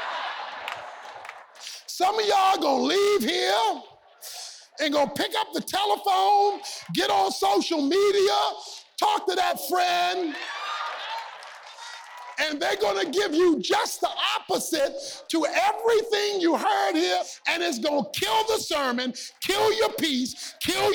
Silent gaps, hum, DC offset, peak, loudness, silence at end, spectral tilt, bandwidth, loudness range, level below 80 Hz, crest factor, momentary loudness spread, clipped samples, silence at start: none; none; under 0.1%; -10 dBFS; -24 LUFS; 0 s; -2.5 dB/octave; over 20 kHz; 4 LU; -64 dBFS; 14 dB; 16 LU; under 0.1%; 0 s